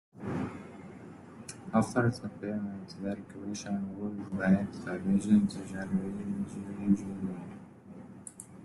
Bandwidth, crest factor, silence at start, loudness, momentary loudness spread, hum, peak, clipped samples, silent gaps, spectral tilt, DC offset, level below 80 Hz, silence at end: 12 kHz; 20 dB; 0.15 s; -33 LUFS; 20 LU; none; -14 dBFS; under 0.1%; none; -7 dB/octave; under 0.1%; -66 dBFS; 0 s